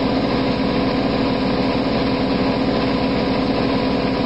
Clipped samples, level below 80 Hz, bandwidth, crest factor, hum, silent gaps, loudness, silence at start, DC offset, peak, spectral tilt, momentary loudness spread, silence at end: under 0.1%; -36 dBFS; 8 kHz; 12 dB; none; none; -19 LUFS; 0 s; 0.7%; -8 dBFS; -7.5 dB/octave; 0 LU; 0 s